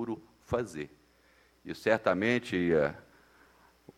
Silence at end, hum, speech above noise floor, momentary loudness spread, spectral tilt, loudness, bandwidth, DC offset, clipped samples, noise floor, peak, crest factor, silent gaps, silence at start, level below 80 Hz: 0.95 s; none; 35 dB; 18 LU; -6 dB/octave; -30 LUFS; 15.5 kHz; under 0.1%; under 0.1%; -65 dBFS; -12 dBFS; 22 dB; none; 0 s; -60 dBFS